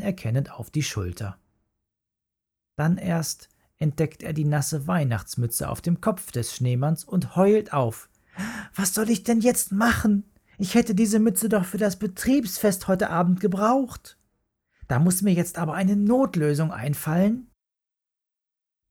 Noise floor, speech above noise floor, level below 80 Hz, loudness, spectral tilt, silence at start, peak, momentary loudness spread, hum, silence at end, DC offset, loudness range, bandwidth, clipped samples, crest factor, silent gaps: -88 dBFS; 65 dB; -52 dBFS; -24 LUFS; -5.5 dB/octave; 0 s; -6 dBFS; 10 LU; none; 1.45 s; under 0.1%; 6 LU; 18 kHz; under 0.1%; 18 dB; none